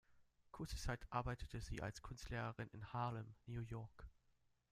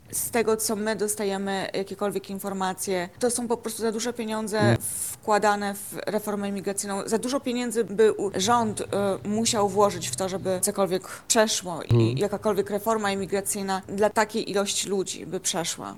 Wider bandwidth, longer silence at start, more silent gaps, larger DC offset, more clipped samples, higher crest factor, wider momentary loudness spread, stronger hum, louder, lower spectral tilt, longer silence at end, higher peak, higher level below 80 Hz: second, 15 kHz vs 18.5 kHz; about the same, 0.1 s vs 0.1 s; neither; second, under 0.1% vs 0.1%; neither; about the same, 20 dB vs 22 dB; first, 10 LU vs 7 LU; neither; second, -49 LUFS vs -26 LUFS; first, -5.5 dB/octave vs -4 dB/octave; first, 0.6 s vs 0 s; second, -28 dBFS vs -4 dBFS; about the same, -58 dBFS vs -58 dBFS